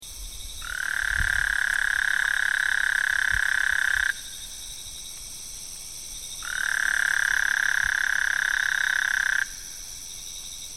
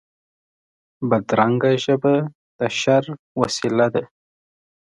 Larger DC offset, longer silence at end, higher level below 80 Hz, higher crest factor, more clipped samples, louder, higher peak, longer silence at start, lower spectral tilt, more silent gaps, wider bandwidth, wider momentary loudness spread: first, 0.4% vs under 0.1%; second, 0 s vs 0.85 s; first, -44 dBFS vs -62 dBFS; about the same, 16 dB vs 20 dB; neither; second, -23 LUFS vs -20 LUFS; second, -10 dBFS vs 0 dBFS; second, 0 s vs 1 s; second, 1 dB/octave vs -5.5 dB/octave; second, none vs 2.35-2.59 s, 3.19-3.35 s; first, 16 kHz vs 11.5 kHz; first, 14 LU vs 9 LU